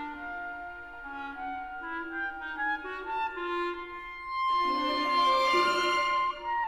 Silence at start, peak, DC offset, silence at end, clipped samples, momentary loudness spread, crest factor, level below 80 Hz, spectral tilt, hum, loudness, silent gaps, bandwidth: 0 s; -14 dBFS; under 0.1%; 0 s; under 0.1%; 15 LU; 16 dB; -58 dBFS; -2 dB/octave; none; -30 LUFS; none; 15 kHz